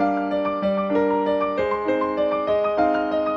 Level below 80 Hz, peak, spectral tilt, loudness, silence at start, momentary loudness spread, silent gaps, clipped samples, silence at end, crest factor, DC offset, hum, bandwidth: -52 dBFS; -8 dBFS; -8 dB/octave; -22 LUFS; 0 s; 3 LU; none; under 0.1%; 0 s; 12 dB; under 0.1%; none; 7 kHz